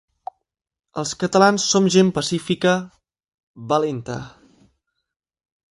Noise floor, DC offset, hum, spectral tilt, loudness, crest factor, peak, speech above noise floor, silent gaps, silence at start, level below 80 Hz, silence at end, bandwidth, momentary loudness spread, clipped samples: -86 dBFS; under 0.1%; none; -4.5 dB/octave; -19 LUFS; 20 dB; -2 dBFS; 67 dB; 3.34-3.54 s; 0.95 s; -58 dBFS; 1.45 s; 11.5 kHz; 24 LU; under 0.1%